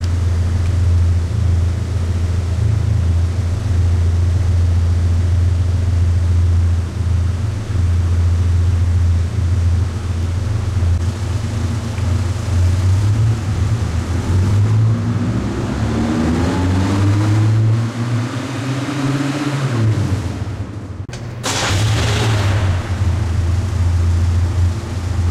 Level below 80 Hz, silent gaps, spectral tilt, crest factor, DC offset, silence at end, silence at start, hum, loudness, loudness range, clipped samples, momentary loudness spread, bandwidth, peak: -24 dBFS; none; -6.5 dB/octave; 10 dB; under 0.1%; 0 s; 0 s; none; -17 LUFS; 3 LU; under 0.1%; 5 LU; 11 kHz; -4 dBFS